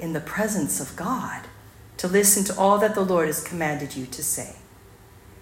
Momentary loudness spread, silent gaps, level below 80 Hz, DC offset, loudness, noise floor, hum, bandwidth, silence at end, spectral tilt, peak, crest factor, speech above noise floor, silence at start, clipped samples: 14 LU; none; -54 dBFS; under 0.1%; -23 LUFS; -49 dBFS; none; 16.5 kHz; 0 s; -3.5 dB/octave; -4 dBFS; 20 dB; 25 dB; 0 s; under 0.1%